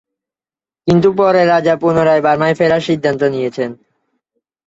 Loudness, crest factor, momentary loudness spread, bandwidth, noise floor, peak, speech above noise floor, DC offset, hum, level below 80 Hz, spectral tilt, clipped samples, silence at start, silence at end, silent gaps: -13 LUFS; 14 dB; 9 LU; 8 kHz; under -90 dBFS; 0 dBFS; over 77 dB; under 0.1%; none; -52 dBFS; -7 dB/octave; under 0.1%; 0.85 s; 0.9 s; none